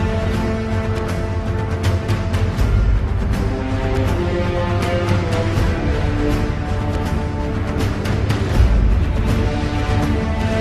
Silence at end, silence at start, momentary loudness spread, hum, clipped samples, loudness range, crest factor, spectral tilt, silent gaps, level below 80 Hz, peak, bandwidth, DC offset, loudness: 0 s; 0 s; 4 LU; none; under 0.1%; 1 LU; 14 dB; -7 dB/octave; none; -22 dBFS; -2 dBFS; 13.5 kHz; under 0.1%; -20 LUFS